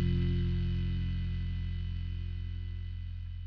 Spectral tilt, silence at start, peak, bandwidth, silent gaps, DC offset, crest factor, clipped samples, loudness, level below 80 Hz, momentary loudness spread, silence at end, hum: -8 dB/octave; 0 s; -20 dBFS; 5.2 kHz; none; under 0.1%; 12 dB; under 0.1%; -36 LUFS; -38 dBFS; 9 LU; 0 s; 50 Hz at -65 dBFS